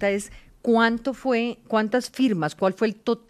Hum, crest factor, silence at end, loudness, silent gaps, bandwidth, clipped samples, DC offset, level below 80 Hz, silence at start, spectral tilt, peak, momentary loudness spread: none; 16 dB; 0.1 s; -24 LUFS; none; 14 kHz; under 0.1%; under 0.1%; -56 dBFS; 0 s; -5.5 dB/octave; -6 dBFS; 7 LU